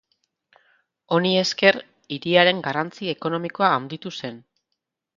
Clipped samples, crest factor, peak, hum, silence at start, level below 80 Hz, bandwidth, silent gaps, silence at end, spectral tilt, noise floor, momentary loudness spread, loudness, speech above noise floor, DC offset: under 0.1%; 24 dB; 0 dBFS; none; 1.1 s; -70 dBFS; 7.6 kHz; none; 0.8 s; -4.5 dB/octave; -80 dBFS; 15 LU; -21 LUFS; 59 dB; under 0.1%